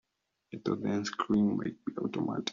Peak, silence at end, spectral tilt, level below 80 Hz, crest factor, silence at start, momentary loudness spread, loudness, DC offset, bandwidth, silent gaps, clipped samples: -16 dBFS; 0 s; -5.5 dB/octave; -68 dBFS; 16 dB; 0.5 s; 9 LU; -33 LUFS; under 0.1%; 7.4 kHz; none; under 0.1%